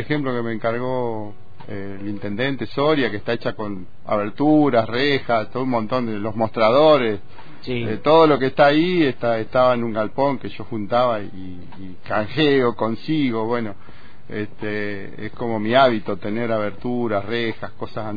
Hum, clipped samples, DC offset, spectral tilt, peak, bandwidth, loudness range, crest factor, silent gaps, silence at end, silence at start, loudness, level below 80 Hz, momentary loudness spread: none; under 0.1%; 4%; -8 dB/octave; -4 dBFS; 5 kHz; 6 LU; 18 dB; none; 0 s; 0 s; -20 LUFS; -52 dBFS; 16 LU